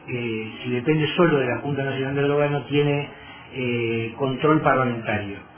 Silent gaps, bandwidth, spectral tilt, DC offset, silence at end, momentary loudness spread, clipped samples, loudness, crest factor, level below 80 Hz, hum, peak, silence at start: none; 3.5 kHz; -10.5 dB/octave; under 0.1%; 0.1 s; 9 LU; under 0.1%; -23 LUFS; 20 dB; -54 dBFS; none; -4 dBFS; 0 s